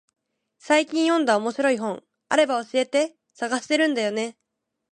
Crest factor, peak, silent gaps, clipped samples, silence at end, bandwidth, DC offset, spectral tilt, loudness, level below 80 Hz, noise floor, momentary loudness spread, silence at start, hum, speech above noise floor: 20 dB; -4 dBFS; none; under 0.1%; 0.6 s; 11 kHz; under 0.1%; -3 dB/octave; -23 LUFS; -78 dBFS; -57 dBFS; 9 LU; 0.65 s; none; 35 dB